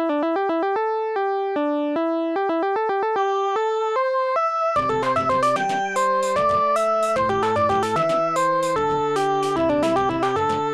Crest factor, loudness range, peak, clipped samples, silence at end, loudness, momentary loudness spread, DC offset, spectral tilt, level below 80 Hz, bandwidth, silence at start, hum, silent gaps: 12 dB; 2 LU; -10 dBFS; under 0.1%; 0 s; -21 LUFS; 3 LU; under 0.1%; -5 dB/octave; -54 dBFS; 13.5 kHz; 0 s; none; none